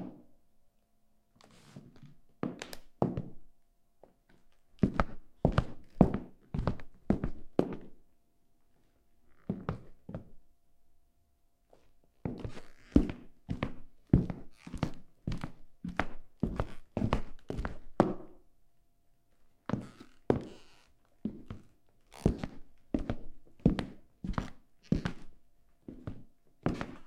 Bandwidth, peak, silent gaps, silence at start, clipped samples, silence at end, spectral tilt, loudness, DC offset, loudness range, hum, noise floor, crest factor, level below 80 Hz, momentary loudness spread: 12.5 kHz; -6 dBFS; none; 0 s; under 0.1%; 0 s; -8 dB/octave; -36 LUFS; under 0.1%; 11 LU; none; -70 dBFS; 30 dB; -46 dBFS; 20 LU